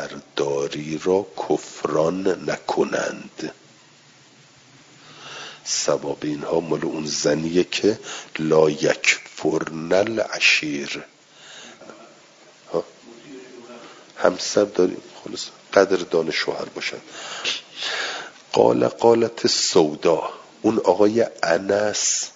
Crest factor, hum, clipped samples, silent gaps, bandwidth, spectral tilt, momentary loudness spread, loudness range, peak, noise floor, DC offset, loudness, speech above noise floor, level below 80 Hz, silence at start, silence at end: 22 dB; none; under 0.1%; none; 7.8 kHz; -3 dB/octave; 17 LU; 10 LU; 0 dBFS; -51 dBFS; under 0.1%; -21 LUFS; 30 dB; -64 dBFS; 0 s; 0.05 s